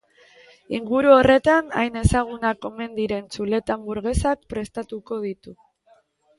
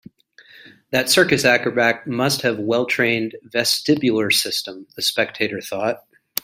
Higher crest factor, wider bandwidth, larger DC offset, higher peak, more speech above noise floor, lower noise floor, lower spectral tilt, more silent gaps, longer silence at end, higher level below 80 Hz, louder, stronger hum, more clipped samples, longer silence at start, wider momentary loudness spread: about the same, 20 dB vs 20 dB; second, 11.5 kHz vs 16 kHz; neither; about the same, -2 dBFS vs 0 dBFS; first, 38 dB vs 30 dB; first, -59 dBFS vs -49 dBFS; first, -6 dB/octave vs -3 dB/octave; neither; first, 0.85 s vs 0.45 s; first, -38 dBFS vs -60 dBFS; second, -22 LUFS vs -19 LUFS; neither; neither; about the same, 0.7 s vs 0.6 s; first, 16 LU vs 9 LU